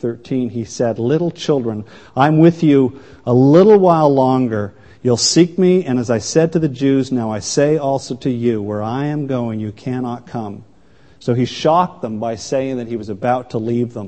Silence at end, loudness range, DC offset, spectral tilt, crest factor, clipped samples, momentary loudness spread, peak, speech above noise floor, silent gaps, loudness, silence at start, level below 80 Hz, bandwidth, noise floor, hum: 0 s; 8 LU; 0.4%; -6 dB/octave; 16 dB; under 0.1%; 13 LU; 0 dBFS; 34 dB; none; -16 LUFS; 0 s; -54 dBFS; 8.8 kHz; -50 dBFS; none